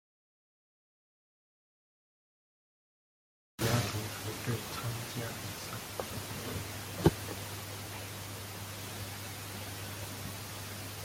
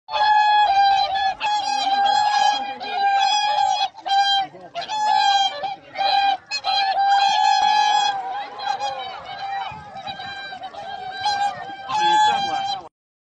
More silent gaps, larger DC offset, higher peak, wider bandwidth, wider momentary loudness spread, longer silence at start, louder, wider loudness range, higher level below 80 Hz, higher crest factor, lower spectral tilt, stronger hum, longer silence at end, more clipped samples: neither; neither; about the same, -10 dBFS vs -8 dBFS; first, 17 kHz vs 9.6 kHz; second, 10 LU vs 15 LU; first, 3.6 s vs 0.1 s; second, -38 LUFS vs -20 LUFS; second, 5 LU vs 9 LU; about the same, -58 dBFS vs -62 dBFS; first, 28 dB vs 12 dB; first, -4.5 dB/octave vs -0.5 dB/octave; neither; second, 0 s vs 0.4 s; neither